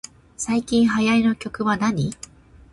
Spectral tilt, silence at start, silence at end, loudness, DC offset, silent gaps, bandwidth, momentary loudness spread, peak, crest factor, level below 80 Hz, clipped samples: -5 dB/octave; 0.4 s; 0.6 s; -21 LUFS; under 0.1%; none; 11.5 kHz; 19 LU; -8 dBFS; 12 dB; -50 dBFS; under 0.1%